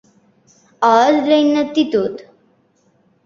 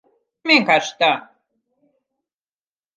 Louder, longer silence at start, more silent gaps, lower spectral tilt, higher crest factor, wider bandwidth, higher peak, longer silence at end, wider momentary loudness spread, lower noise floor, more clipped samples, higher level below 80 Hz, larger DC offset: about the same, -15 LUFS vs -17 LUFS; first, 0.8 s vs 0.45 s; neither; first, -4.5 dB/octave vs -3 dB/octave; about the same, 16 dB vs 20 dB; second, 7.2 kHz vs 9.8 kHz; about the same, -2 dBFS vs -2 dBFS; second, 1.05 s vs 1.75 s; second, 9 LU vs 12 LU; second, -58 dBFS vs under -90 dBFS; neither; first, -64 dBFS vs -80 dBFS; neither